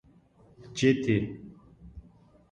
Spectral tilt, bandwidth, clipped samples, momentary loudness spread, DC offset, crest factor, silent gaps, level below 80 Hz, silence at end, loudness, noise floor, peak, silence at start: -6 dB/octave; 10 kHz; under 0.1%; 26 LU; under 0.1%; 22 dB; none; -56 dBFS; 0.5 s; -28 LUFS; -59 dBFS; -10 dBFS; 0.6 s